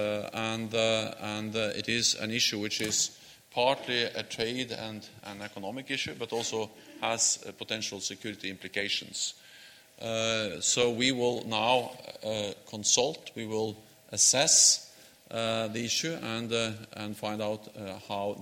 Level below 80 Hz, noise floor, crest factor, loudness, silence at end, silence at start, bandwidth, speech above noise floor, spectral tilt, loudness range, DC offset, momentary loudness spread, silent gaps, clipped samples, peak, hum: -70 dBFS; -54 dBFS; 22 dB; -29 LUFS; 0 s; 0 s; 17 kHz; 23 dB; -1.5 dB/octave; 7 LU; under 0.1%; 14 LU; none; under 0.1%; -10 dBFS; none